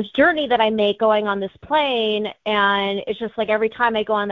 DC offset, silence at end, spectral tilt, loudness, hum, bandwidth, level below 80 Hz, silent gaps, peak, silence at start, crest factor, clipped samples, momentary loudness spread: under 0.1%; 0 s; -6.5 dB/octave; -19 LUFS; none; 6.6 kHz; -56 dBFS; none; -2 dBFS; 0 s; 16 dB; under 0.1%; 7 LU